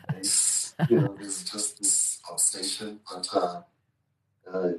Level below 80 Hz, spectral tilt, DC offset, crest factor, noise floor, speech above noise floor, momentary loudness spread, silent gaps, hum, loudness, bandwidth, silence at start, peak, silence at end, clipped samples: -76 dBFS; -3 dB/octave; under 0.1%; 18 dB; -75 dBFS; 47 dB; 13 LU; none; none; -25 LUFS; 13 kHz; 0.1 s; -10 dBFS; 0 s; under 0.1%